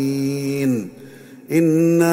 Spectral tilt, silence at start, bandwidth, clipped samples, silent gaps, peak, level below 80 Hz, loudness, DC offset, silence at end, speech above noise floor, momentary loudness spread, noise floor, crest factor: -7 dB/octave; 0 s; 16 kHz; under 0.1%; none; -4 dBFS; -62 dBFS; -19 LUFS; under 0.1%; 0 s; 24 dB; 9 LU; -40 dBFS; 16 dB